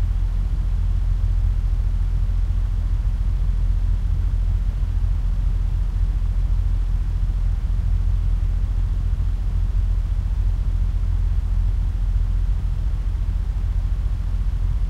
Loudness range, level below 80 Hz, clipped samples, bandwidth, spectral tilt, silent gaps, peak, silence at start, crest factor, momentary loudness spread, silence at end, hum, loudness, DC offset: 1 LU; -20 dBFS; under 0.1%; 4.1 kHz; -8 dB/octave; none; -10 dBFS; 0 s; 10 dB; 2 LU; 0 s; none; -24 LUFS; under 0.1%